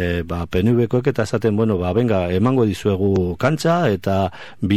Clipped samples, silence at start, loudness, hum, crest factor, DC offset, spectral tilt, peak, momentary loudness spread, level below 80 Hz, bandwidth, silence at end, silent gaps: under 0.1%; 0 s; -19 LUFS; none; 16 dB; 0.9%; -7.5 dB/octave; -2 dBFS; 5 LU; -42 dBFS; 15 kHz; 0 s; none